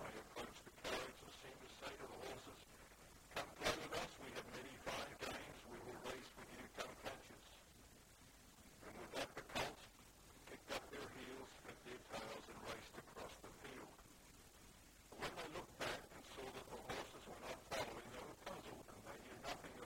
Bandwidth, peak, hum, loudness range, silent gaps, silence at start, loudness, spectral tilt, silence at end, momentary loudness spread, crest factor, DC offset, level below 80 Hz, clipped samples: 16 kHz; -28 dBFS; none; 6 LU; none; 0 s; -51 LUFS; -3 dB/octave; 0 s; 16 LU; 24 dB; under 0.1%; -70 dBFS; under 0.1%